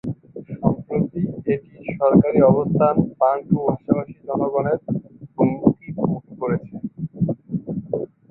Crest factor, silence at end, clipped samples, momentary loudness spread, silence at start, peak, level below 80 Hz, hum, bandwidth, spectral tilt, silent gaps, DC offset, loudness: 20 dB; 0.25 s; under 0.1%; 13 LU; 0.05 s; -2 dBFS; -50 dBFS; none; 3 kHz; -13.5 dB/octave; none; under 0.1%; -21 LUFS